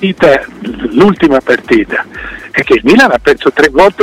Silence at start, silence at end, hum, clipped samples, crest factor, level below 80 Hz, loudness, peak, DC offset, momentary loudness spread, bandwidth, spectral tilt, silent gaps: 0 s; 0 s; none; 0.1%; 8 dB; -36 dBFS; -9 LUFS; 0 dBFS; under 0.1%; 12 LU; 15.5 kHz; -5.5 dB/octave; none